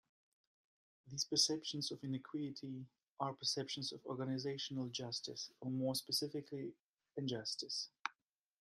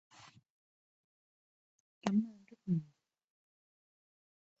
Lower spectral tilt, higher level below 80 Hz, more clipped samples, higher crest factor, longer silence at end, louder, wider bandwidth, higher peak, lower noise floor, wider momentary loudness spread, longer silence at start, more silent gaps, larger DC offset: second, -3.5 dB/octave vs -7.5 dB/octave; about the same, -84 dBFS vs -82 dBFS; neither; about the same, 26 dB vs 26 dB; second, 0.5 s vs 1.75 s; second, -41 LUFS vs -37 LUFS; first, 14.5 kHz vs 7.6 kHz; about the same, -18 dBFS vs -16 dBFS; first, -80 dBFS vs -63 dBFS; second, 12 LU vs 22 LU; first, 1.05 s vs 0.25 s; second, 3.11-3.17 s, 6.83-6.97 s vs 0.50-2.01 s; neither